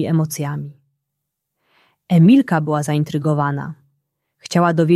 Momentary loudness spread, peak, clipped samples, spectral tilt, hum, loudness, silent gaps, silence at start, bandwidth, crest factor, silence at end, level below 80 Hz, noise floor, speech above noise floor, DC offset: 16 LU; -2 dBFS; under 0.1%; -7 dB/octave; none; -17 LUFS; none; 0 s; 13.5 kHz; 16 dB; 0 s; -62 dBFS; -78 dBFS; 62 dB; under 0.1%